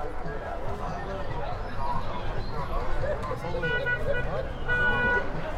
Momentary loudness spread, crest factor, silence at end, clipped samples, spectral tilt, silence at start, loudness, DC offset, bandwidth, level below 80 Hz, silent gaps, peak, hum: 10 LU; 14 dB; 0 s; under 0.1%; -6 dB/octave; 0 s; -30 LUFS; under 0.1%; 7.6 kHz; -34 dBFS; none; -14 dBFS; none